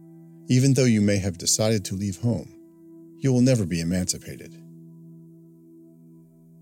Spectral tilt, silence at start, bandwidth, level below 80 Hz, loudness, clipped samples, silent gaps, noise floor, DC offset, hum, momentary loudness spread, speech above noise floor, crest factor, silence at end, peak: -5 dB/octave; 0.5 s; 16.5 kHz; -56 dBFS; -23 LUFS; under 0.1%; none; -51 dBFS; under 0.1%; none; 21 LU; 29 dB; 18 dB; 1.45 s; -8 dBFS